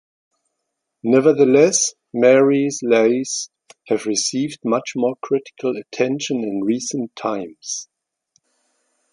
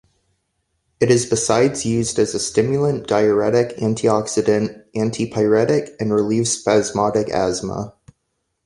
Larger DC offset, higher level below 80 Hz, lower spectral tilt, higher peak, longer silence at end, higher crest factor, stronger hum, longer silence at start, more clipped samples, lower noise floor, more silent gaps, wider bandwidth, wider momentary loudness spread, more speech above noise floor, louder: neither; second, -68 dBFS vs -50 dBFS; about the same, -4 dB/octave vs -5 dB/octave; about the same, -2 dBFS vs -2 dBFS; first, 1.3 s vs 0.75 s; about the same, 18 dB vs 16 dB; neither; about the same, 1.05 s vs 1 s; neither; first, -77 dBFS vs -73 dBFS; neither; about the same, 11.5 kHz vs 11.5 kHz; first, 13 LU vs 6 LU; first, 60 dB vs 55 dB; about the same, -19 LUFS vs -18 LUFS